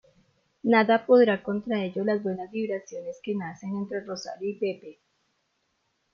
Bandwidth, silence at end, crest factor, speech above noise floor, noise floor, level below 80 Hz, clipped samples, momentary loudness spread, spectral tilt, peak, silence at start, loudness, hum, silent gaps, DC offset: 7.2 kHz; 1.2 s; 18 dB; 48 dB; -74 dBFS; -72 dBFS; under 0.1%; 14 LU; -6 dB/octave; -10 dBFS; 0.65 s; -26 LUFS; none; none; under 0.1%